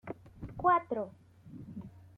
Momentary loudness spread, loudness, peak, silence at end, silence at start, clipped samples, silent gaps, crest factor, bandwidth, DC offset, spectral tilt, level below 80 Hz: 21 LU; -32 LUFS; -14 dBFS; 0.1 s; 0.05 s; under 0.1%; none; 20 dB; 4.8 kHz; under 0.1%; -8.5 dB/octave; -60 dBFS